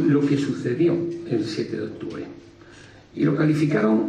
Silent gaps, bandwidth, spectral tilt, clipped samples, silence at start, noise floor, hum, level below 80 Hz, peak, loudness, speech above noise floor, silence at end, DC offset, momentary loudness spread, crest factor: none; 9.8 kHz; -7.5 dB/octave; under 0.1%; 0 s; -47 dBFS; none; -60 dBFS; -8 dBFS; -23 LUFS; 25 dB; 0 s; under 0.1%; 14 LU; 14 dB